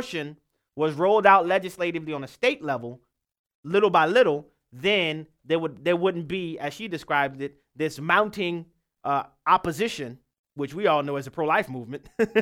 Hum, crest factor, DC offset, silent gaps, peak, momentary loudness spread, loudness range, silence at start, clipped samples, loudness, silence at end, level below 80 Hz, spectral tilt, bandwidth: none; 22 dB; under 0.1%; 3.39-3.44 s, 3.55-3.63 s, 10.39-10.44 s; -4 dBFS; 16 LU; 3 LU; 0 s; under 0.1%; -24 LUFS; 0 s; -62 dBFS; -5.5 dB/octave; 16.5 kHz